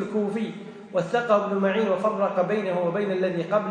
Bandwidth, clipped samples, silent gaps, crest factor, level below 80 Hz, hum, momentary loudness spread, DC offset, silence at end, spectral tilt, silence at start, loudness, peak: 10 kHz; under 0.1%; none; 16 dB; -72 dBFS; none; 7 LU; under 0.1%; 0 s; -7 dB/octave; 0 s; -25 LUFS; -8 dBFS